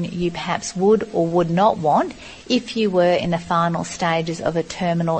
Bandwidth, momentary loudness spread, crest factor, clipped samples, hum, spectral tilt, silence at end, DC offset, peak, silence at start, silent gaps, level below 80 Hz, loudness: 8.8 kHz; 7 LU; 16 dB; under 0.1%; none; -5.5 dB/octave; 0 s; under 0.1%; -4 dBFS; 0 s; none; -50 dBFS; -20 LUFS